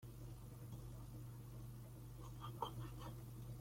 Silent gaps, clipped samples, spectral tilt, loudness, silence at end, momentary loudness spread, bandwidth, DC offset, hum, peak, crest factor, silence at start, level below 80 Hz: none; under 0.1%; -6 dB/octave; -53 LUFS; 0 s; 7 LU; 16.5 kHz; under 0.1%; none; -30 dBFS; 22 dB; 0 s; -60 dBFS